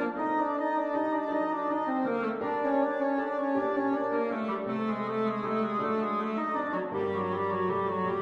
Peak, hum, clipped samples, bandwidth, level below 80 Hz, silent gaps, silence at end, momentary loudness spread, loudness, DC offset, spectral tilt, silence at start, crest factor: -16 dBFS; none; under 0.1%; 7.4 kHz; -72 dBFS; none; 0 s; 3 LU; -30 LUFS; under 0.1%; -8 dB/octave; 0 s; 14 dB